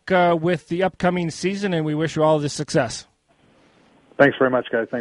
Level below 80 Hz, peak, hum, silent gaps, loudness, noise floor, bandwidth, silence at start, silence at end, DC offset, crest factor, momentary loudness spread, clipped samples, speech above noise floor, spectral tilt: -56 dBFS; -2 dBFS; none; none; -21 LUFS; -58 dBFS; 11.5 kHz; 0.05 s; 0 s; under 0.1%; 20 dB; 7 LU; under 0.1%; 38 dB; -5.5 dB/octave